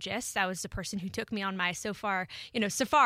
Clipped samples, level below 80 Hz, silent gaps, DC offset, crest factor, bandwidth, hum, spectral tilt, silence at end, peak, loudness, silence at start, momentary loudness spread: under 0.1%; -56 dBFS; none; under 0.1%; 20 dB; 16.5 kHz; none; -3 dB/octave; 0 s; -10 dBFS; -32 LUFS; 0 s; 6 LU